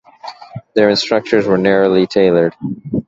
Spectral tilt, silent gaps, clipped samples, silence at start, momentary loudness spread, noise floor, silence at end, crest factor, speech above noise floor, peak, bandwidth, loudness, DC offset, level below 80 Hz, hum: -6 dB/octave; none; under 0.1%; 0.25 s; 19 LU; -34 dBFS; 0.05 s; 14 dB; 21 dB; 0 dBFS; 7.8 kHz; -14 LUFS; under 0.1%; -50 dBFS; none